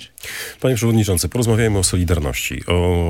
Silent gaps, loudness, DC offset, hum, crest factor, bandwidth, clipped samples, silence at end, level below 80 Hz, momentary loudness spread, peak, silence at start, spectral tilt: none; -18 LUFS; under 0.1%; none; 16 dB; 17 kHz; under 0.1%; 0 s; -34 dBFS; 9 LU; -2 dBFS; 0 s; -5 dB/octave